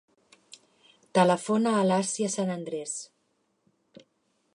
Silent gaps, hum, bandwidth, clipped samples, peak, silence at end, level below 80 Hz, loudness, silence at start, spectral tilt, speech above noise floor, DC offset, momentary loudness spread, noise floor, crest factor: none; none; 11 kHz; under 0.1%; -8 dBFS; 1.5 s; -78 dBFS; -27 LUFS; 0.5 s; -5 dB/octave; 47 dB; under 0.1%; 12 LU; -73 dBFS; 20 dB